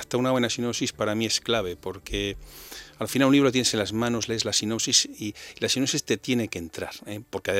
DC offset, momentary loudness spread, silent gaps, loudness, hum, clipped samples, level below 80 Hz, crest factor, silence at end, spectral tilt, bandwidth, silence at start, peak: under 0.1%; 15 LU; none; -25 LUFS; none; under 0.1%; -50 dBFS; 20 dB; 0 s; -3 dB/octave; 16 kHz; 0 s; -6 dBFS